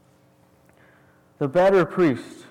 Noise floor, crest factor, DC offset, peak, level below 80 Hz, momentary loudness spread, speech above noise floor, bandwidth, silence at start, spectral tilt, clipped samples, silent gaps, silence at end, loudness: -58 dBFS; 12 dB; under 0.1%; -12 dBFS; -58 dBFS; 12 LU; 38 dB; 12 kHz; 1.4 s; -7.5 dB/octave; under 0.1%; none; 0.15 s; -21 LUFS